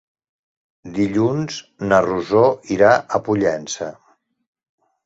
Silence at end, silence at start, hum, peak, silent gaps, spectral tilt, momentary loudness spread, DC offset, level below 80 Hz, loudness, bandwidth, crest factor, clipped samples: 1.15 s; 0.85 s; none; -2 dBFS; none; -5.5 dB/octave; 13 LU; under 0.1%; -54 dBFS; -18 LUFS; 8 kHz; 18 dB; under 0.1%